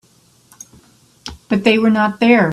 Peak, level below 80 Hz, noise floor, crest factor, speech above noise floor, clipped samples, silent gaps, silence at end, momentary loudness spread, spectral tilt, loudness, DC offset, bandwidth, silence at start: 0 dBFS; -50 dBFS; -52 dBFS; 16 dB; 39 dB; under 0.1%; none; 0 s; 21 LU; -6 dB/octave; -14 LUFS; under 0.1%; 12 kHz; 1.25 s